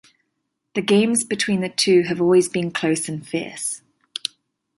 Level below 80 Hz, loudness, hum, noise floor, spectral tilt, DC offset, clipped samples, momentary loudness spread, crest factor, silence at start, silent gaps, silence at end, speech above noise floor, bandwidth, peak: -64 dBFS; -20 LUFS; none; -76 dBFS; -4 dB/octave; under 0.1%; under 0.1%; 12 LU; 16 dB; 0.75 s; none; 1 s; 56 dB; 12 kHz; -6 dBFS